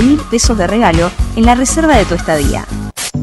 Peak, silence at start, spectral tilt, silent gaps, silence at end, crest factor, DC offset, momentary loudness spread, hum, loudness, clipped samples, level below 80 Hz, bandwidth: 0 dBFS; 0 s; -4.5 dB/octave; none; 0 s; 12 dB; under 0.1%; 9 LU; none; -12 LUFS; 0.6%; -20 dBFS; 13 kHz